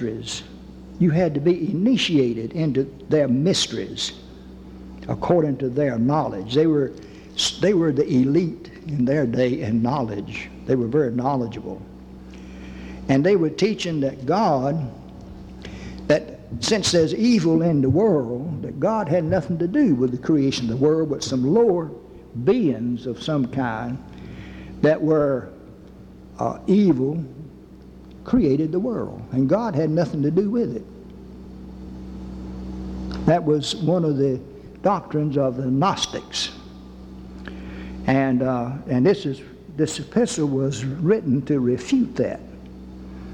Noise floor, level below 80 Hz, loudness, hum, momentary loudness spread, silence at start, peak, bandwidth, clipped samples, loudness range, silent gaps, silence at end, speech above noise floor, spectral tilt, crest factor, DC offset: -43 dBFS; -46 dBFS; -21 LUFS; none; 21 LU; 0 s; -6 dBFS; 11.5 kHz; under 0.1%; 4 LU; none; 0 s; 23 dB; -6 dB/octave; 16 dB; under 0.1%